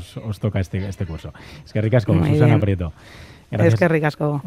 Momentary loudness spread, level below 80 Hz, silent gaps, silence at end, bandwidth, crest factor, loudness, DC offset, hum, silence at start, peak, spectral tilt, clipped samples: 15 LU; -46 dBFS; none; 0 s; 12.5 kHz; 18 dB; -19 LUFS; under 0.1%; none; 0 s; -2 dBFS; -8.5 dB/octave; under 0.1%